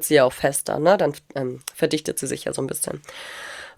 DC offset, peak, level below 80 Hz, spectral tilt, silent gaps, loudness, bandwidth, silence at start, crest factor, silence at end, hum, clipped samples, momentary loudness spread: under 0.1%; -2 dBFS; -58 dBFS; -4 dB/octave; none; -23 LUFS; over 20 kHz; 0 s; 20 dB; 0.05 s; none; under 0.1%; 16 LU